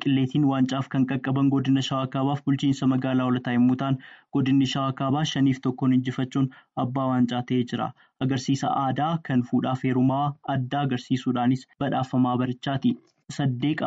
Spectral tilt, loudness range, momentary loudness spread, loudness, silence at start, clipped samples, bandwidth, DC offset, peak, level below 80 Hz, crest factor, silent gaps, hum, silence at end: -7 dB/octave; 2 LU; 6 LU; -25 LUFS; 0 s; under 0.1%; 7.8 kHz; under 0.1%; -12 dBFS; -62 dBFS; 12 dB; none; none; 0 s